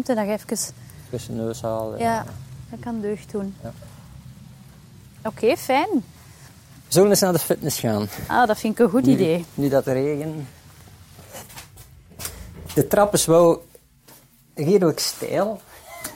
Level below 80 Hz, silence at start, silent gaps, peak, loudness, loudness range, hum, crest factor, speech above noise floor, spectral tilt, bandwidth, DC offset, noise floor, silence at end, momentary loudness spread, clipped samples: -52 dBFS; 0 s; none; -4 dBFS; -21 LUFS; 9 LU; none; 18 dB; 30 dB; -5 dB/octave; 17 kHz; under 0.1%; -51 dBFS; 0 s; 22 LU; under 0.1%